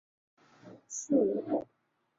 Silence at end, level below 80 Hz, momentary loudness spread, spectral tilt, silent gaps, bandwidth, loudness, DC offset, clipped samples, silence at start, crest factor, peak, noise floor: 0.6 s; -74 dBFS; 13 LU; -6 dB/octave; none; 7.8 kHz; -32 LUFS; under 0.1%; under 0.1%; 0.65 s; 20 dB; -16 dBFS; -55 dBFS